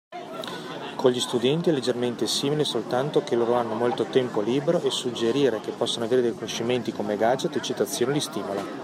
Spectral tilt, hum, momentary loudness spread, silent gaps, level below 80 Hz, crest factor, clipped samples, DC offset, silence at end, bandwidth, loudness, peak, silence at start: -4.5 dB/octave; none; 7 LU; none; -72 dBFS; 18 dB; under 0.1%; under 0.1%; 0 s; 16 kHz; -25 LUFS; -6 dBFS; 0.1 s